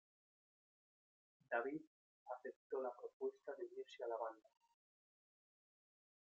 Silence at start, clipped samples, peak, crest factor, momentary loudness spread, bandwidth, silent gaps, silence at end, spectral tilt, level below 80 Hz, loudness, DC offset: 1.5 s; under 0.1%; -28 dBFS; 24 dB; 9 LU; 7.6 kHz; 1.87-2.26 s, 2.56-2.70 s, 3.13-3.20 s; 1.9 s; -2.5 dB/octave; under -90 dBFS; -49 LUFS; under 0.1%